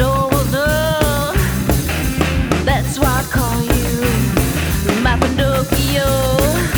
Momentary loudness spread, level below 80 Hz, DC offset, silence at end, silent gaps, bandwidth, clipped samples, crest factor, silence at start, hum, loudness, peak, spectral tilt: 2 LU; -22 dBFS; under 0.1%; 0 s; none; over 20 kHz; under 0.1%; 16 dB; 0 s; none; -16 LUFS; 0 dBFS; -5 dB/octave